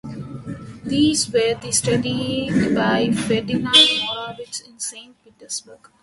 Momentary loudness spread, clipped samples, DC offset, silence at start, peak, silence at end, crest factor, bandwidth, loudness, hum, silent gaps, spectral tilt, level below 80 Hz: 20 LU; under 0.1%; under 0.1%; 0.05 s; 0 dBFS; 0.25 s; 20 dB; 11.5 kHz; -19 LUFS; none; none; -3.5 dB/octave; -50 dBFS